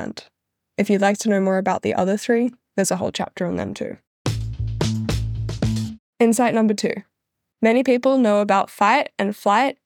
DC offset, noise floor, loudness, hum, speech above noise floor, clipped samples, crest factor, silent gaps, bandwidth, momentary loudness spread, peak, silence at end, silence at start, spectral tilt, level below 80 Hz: under 0.1%; -79 dBFS; -20 LUFS; none; 60 dB; under 0.1%; 18 dB; 4.07-4.25 s, 5.99-6.13 s; 18.5 kHz; 11 LU; -2 dBFS; 0.15 s; 0 s; -5.5 dB/octave; -40 dBFS